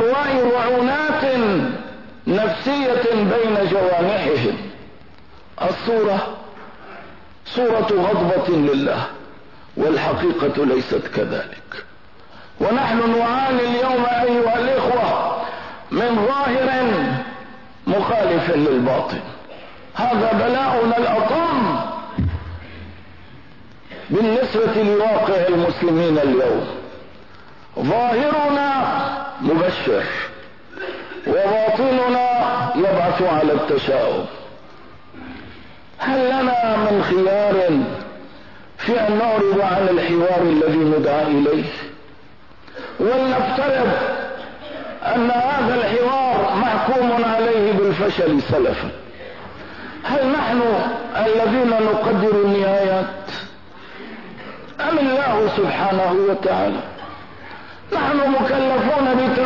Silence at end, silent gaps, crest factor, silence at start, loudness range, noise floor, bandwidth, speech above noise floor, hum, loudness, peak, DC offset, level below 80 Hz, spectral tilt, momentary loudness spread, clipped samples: 0 s; none; 10 dB; 0 s; 4 LU; -46 dBFS; 6 kHz; 29 dB; none; -18 LUFS; -8 dBFS; 0.8%; -50 dBFS; -7.5 dB/octave; 18 LU; under 0.1%